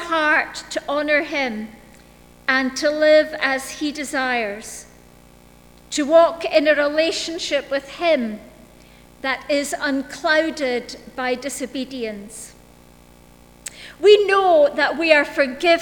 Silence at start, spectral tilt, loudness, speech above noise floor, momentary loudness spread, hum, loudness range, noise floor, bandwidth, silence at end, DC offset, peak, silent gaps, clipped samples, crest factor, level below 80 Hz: 0 s; -2.5 dB/octave; -19 LUFS; 29 dB; 18 LU; 60 Hz at -55 dBFS; 5 LU; -48 dBFS; 19 kHz; 0 s; under 0.1%; 0 dBFS; none; under 0.1%; 20 dB; -54 dBFS